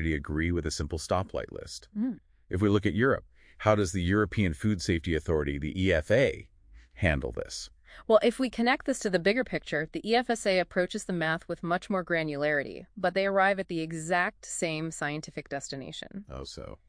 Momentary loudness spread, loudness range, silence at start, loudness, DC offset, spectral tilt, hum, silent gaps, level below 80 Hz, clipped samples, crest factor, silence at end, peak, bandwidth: 13 LU; 2 LU; 0 s; -29 LUFS; under 0.1%; -5.5 dB/octave; none; none; -46 dBFS; under 0.1%; 20 dB; 0.15 s; -8 dBFS; 10.5 kHz